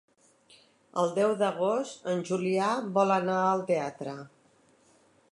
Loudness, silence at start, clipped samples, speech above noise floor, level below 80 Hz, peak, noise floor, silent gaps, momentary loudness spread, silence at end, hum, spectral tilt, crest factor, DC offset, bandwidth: -28 LUFS; 0.95 s; under 0.1%; 36 dB; -80 dBFS; -12 dBFS; -64 dBFS; none; 11 LU; 1.05 s; none; -5.5 dB/octave; 18 dB; under 0.1%; 11.5 kHz